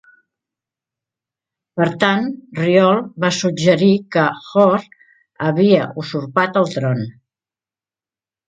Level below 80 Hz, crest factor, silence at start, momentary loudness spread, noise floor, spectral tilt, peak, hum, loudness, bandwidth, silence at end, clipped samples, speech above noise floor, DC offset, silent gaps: -62 dBFS; 18 dB; 1.75 s; 10 LU; under -90 dBFS; -6 dB/octave; 0 dBFS; none; -17 LUFS; 9 kHz; 1.4 s; under 0.1%; over 74 dB; under 0.1%; none